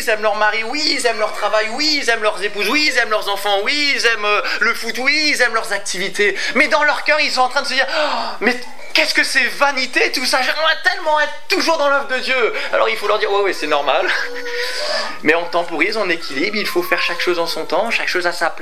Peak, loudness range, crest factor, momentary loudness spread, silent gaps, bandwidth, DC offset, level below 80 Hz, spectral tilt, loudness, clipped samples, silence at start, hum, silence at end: 0 dBFS; 3 LU; 18 dB; 6 LU; none; 16 kHz; 5%; -68 dBFS; -1.5 dB/octave; -16 LUFS; under 0.1%; 0 s; none; 0 s